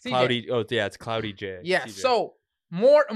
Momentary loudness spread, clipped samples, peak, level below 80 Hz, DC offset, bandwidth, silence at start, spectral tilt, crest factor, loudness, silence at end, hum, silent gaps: 13 LU; under 0.1%; -8 dBFS; -66 dBFS; under 0.1%; 12.5 kHz; 0.05 s; -5 dB/octave; 16 dB; -25 LUFS; 0 s; none; none